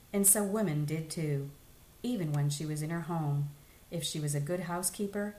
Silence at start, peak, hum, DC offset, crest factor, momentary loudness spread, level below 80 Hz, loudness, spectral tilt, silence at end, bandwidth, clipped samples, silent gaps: 0.1 s; -10 dBFS; none; under 0.1%; 22 dB; 12 LU; -62 dBFS; -32 LUFS; -4.5 dB/octave; 0 s; 15.5 kHz; under 0.1%; none